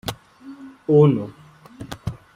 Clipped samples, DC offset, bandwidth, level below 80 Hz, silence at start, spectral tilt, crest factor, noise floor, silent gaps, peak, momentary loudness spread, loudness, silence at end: under 0.1%; under 0.1%; 16 kHz; -52 dBFS; 0.05 s; -8 dB/octave; 18 dB; -42 dBFS; none; -4 dBFS; 25 LU; -17 LUFS; 0.2 s